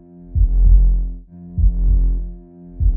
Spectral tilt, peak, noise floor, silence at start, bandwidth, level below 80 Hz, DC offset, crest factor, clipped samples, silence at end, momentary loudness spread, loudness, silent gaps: -15 dB/octave; -2 dBFS; -36 dBFS; 0.25 s; 0.8 kHz; -16 dBFS; under 0.1%; 14 dB; under 0.1%; 0 s; 18 LU; -19 LUFS; none